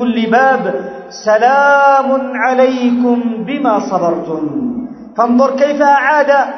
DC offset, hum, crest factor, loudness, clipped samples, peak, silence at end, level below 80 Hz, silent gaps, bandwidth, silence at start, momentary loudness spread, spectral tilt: under 0.1%; none; 12 dB; -12 LUFS; under 0.1%; 0 dBFS; 0 s; -56 dBFS; none; 6.4 kHz; 0 s; 11 LU; -5.5 dB/octave